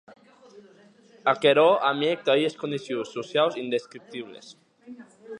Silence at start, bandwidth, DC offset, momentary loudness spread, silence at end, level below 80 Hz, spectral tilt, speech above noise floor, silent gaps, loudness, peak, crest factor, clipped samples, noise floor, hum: 0.55 s; 10.5 kHz; under 0.1%; 20 LU; 0 s; -80 dBFS; -5 dB/octave; 31 dB; none; -24 LUFS; -6 dBFS; 22 dB; under 0.1%; -55 dBFS; none